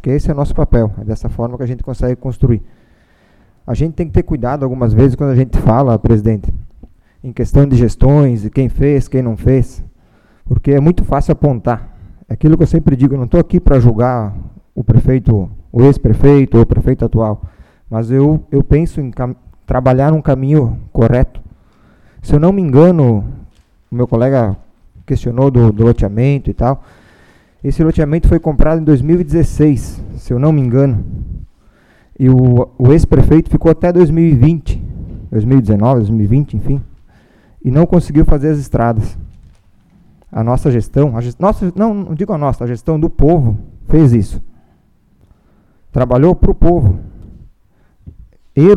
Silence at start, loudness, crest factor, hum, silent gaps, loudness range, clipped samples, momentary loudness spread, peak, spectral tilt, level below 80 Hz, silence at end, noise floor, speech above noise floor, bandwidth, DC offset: 0.05 s; -13 LUFS; 12 dB; none; none; 4 LU; 0.6%; 12 LU; 0 dBFS; -10 dB/octave; -22 dBFS; 0 s; -51 dBFS; 40 dB; 10.5 kHz; under 0.1%